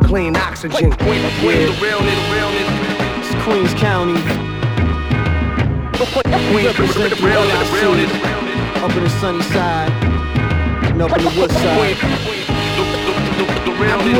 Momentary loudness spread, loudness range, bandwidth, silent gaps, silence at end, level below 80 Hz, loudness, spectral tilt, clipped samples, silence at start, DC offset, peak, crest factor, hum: 5 LU; 2 LU; 17.5 kHz; none; 0 s; -26 dBFS; -16 LUFS; -6 dB/octave; under 0.1%; 0 s; under 0.1%; 0 dBFS; 16 dB; none